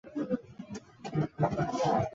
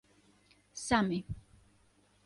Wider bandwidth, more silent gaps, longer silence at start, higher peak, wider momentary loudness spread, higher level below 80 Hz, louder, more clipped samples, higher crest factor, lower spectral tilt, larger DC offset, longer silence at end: second, 7.8 kHz vs 11.5 kHz; neither; second, 0.05 s vs 0.75 s; about the same, -14 dBFS vs -14 dBFS; about the same, 16 LU vs 18 LU; about the same, -58 dBFS vs -56 dBFS; about the same, -32 LUFS vs -33 LUFS; neither; second, 18 dB vs 24 dB; first, -7 dB/octave vs -4.5 dB/octave; neither; second, 0 s vs 0.85 s